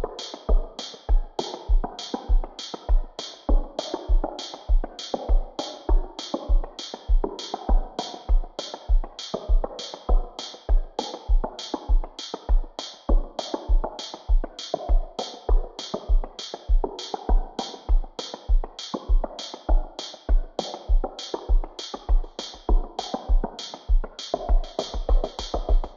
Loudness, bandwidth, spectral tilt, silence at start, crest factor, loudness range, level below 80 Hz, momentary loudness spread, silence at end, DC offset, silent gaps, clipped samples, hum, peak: -29 LUFS; 7.4 kHz; -5.5 dB/octave; 0 s; 14 dB; 0 LU; -24 dBFS; 7 LU; 0 s; under 0.1%; none; under 0.1%; none; -10 dBFS